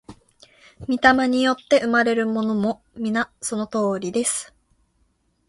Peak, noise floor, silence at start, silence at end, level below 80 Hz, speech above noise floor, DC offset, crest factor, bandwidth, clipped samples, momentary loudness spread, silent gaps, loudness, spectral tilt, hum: 0 dBFS; -66 dBFS; 0.1 s; 1.05 s; -56 dBFS; 45 dB; under 0.1%; 22 dB; 11.5 kHz; under 0.1%; 11 LU; none; -21 LUFS; -3.5 dB/octave; none